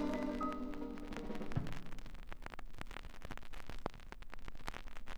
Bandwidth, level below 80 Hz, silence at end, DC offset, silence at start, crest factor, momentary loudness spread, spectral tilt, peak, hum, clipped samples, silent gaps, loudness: 13.5 kHz; -50 dBFS; 0 s; under 0.1%; 0 s; 22 dB; 14 LU; -6.5 dB/octave; -20 dBFS; none; under 0.1%; none; -47 LUFS